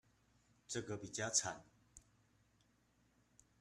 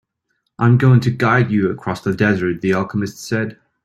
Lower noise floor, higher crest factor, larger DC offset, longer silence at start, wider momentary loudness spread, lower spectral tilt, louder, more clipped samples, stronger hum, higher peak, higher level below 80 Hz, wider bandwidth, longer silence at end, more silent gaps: first, -76 dBFS vs -71 dBFS; first, 28 dB vs 16 dB; neither; about the same, 0.7 s vs 0.6 s; about the same, 11 LU vs 10 LU; second, -2 dB/octave vs -7.5 dB/octave; second, -41 LUFS vs -17 LUFS; neither; neither; second, -20 dBFS vs -2 dBFS; second, -76 dBFS vs -52 dBFS; about the same, 13 kHz vs 12.5 kHz; first, 1.6 s vs 0.3 s; neither